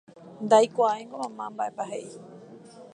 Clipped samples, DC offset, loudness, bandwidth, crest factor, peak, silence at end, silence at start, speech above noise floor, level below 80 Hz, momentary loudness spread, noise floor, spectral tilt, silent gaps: under 0.1%; under 0.1%; -26 LUFS; 10.5 kHz; 20 dB; -6 dBFS; 0.1 s; 0.25 s; 22 dB; -82 dBFS; 22 LU; -47 dBFS; -4.5 dB/octave; none